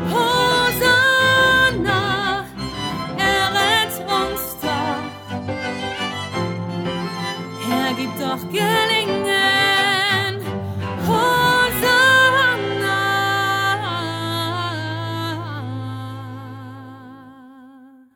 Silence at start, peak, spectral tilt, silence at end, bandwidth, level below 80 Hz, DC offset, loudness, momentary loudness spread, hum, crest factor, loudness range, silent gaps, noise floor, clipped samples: 0 s; -4 dBFS; -3.5 dB/octave; 0.3 s; over 20 kHz; -46 dBFS; under 0.1%; -18 LUFS; 15 LU; none; 16 dB; 9 LU; none; -45 dBFS; under 0.1%